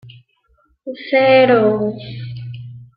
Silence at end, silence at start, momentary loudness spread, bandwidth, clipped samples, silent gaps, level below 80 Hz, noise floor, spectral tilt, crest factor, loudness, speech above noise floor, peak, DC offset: 0.15 s; 0.05 s; 21 LU; 5.2 kHz; under 0.1%; none; -56 dBFS; -60 dBFS; -10 dB/octave; 16 dB; -14 LUFS; 46 dB; -2 dBFS; under 0.1%